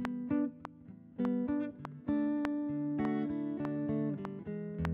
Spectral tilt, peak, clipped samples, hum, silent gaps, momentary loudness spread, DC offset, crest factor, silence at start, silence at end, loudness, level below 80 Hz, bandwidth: -8 dB/octave; -14 dBFS; under 0.1%; none; none; 9 LU; under 0.1%; 20 dB; 0 s; 0 s; -36 LUFS; -58 dBFS; 5.4 kHz